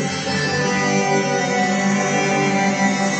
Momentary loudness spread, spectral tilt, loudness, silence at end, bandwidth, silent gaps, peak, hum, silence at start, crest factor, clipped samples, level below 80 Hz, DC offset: 2 LU; -4 dB/octave; -18 LUFS; 0 s; 9 kHz; none; -6 dBFS; none; 0 s; 14 dB; under 0.1%; -58 dBFS; under 0.1%